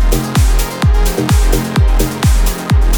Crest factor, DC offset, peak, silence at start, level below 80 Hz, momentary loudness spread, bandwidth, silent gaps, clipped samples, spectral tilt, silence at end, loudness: 10 dB; under 0.1%; -2 dBFS; 0 s; -12 dBFS; 1 LU; over 20 kHz; none; under 0.1%; -5 dB/octave; 0 s; -14 LUFS